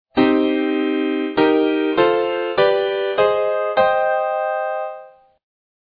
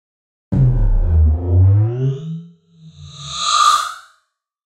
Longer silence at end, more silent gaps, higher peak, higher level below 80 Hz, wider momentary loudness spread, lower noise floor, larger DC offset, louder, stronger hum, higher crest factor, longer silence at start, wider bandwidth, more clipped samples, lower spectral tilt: about the same, 0.75 s vs 0.8 s; neither; about the same, -2 dBFS vs -2 dBFS; second, -58 dBFS vs -22 dBFS; second, 6 LU vs 19 LU; second, -41 dBFS vs -65 dBFS; neither; about the same, -18 LUFS vs -16 LUFS; neither; about the same, 16 dB vs 14 dB; second, 0.15 s vs 0.5 s; second, 5 kHz vs 13 kHz; neither; first, -8 dB/octave vs -5 dB/octave